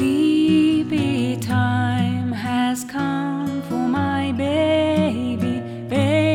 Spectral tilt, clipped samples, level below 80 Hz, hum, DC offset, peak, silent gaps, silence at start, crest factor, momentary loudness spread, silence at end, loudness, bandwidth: -6.5 dB/octave; under 0.1%; -54 dBFS; none; under 0.1%; -8 dBFS; none; 0 s; 12 dB; 7 LU; 0 s; -20 LUFS; 16 kHz